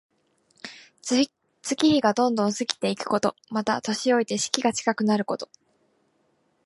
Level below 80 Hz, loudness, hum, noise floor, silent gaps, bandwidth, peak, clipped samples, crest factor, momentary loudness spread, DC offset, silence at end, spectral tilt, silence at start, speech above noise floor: -68 dBFS; -24 LUFS; none; -68 dBFS; none; 11.5 kHz; 0 dBFS; under 0.1%; 26 dB; 16 LU; under 0.1%; 1.2 s; -3.5 dB/octave; 0.65 s; 45 dB